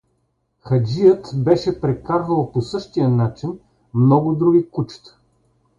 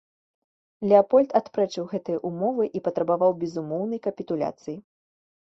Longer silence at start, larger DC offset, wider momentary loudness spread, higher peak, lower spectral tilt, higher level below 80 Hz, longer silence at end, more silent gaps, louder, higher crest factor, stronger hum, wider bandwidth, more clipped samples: second, 0.65 s vs 0.8 s; neither; about the same, 12 LU vs 11 LU; about the same, -2 dBFS vs -4 dBFS; first, -9 dB/octave vs -7.5 dB/octave; first, -50 dBFS vs -68 dBFS; about the same, 0.8 s vs 0.7 s; neither; first, -18 LUFS vs -24 LUFS; about the same, 16 dB vs 20 dB; neither; about the same, 7.6 kHz vs 7.6 kHz; neither